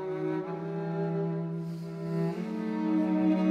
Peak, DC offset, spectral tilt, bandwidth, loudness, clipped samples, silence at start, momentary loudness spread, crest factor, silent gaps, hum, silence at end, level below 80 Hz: -16 dBFS; under 0.1%; -9.5 dB/octave; 7.2 kHz; -31 LUFS; under 0.1%; 0 s; 9 LU; 14 dB; none; none; 0 s; -72 dBFS